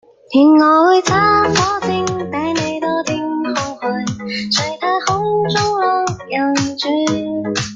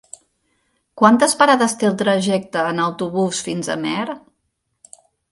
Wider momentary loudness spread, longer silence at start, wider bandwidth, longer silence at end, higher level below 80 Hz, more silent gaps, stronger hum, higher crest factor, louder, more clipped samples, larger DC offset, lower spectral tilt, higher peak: about the same, 10 LU vs 10 LU; second, 0.3 s vs 0.95 s; second, 9.2 kHz vs 11.5 kHz; second, 0 s vs 1.15 s; first, -50 dBFS vs -62 dBFS; neither; neither; about the same, 16 dB vs 20 dB; about the same, -16 LUFS vs -18 LUFS; neither; neither; about the same, -4.5 dB/octave vs -4 dB/octave; about the same, 0 dBFS vs 0 dBFS